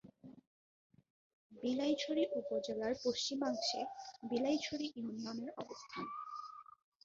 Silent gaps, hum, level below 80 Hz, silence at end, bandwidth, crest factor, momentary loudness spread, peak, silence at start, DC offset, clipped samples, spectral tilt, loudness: 0.47-0.90 s, 1.10-1.50 s; none; -78 dBFS; 0.4 s; 7.4 kHz; 18 dB; 13 LU; -24 dBFS; 0.05 s; under 0.1%; under 0.1%; -2.5 dB/octave; -40 LUFS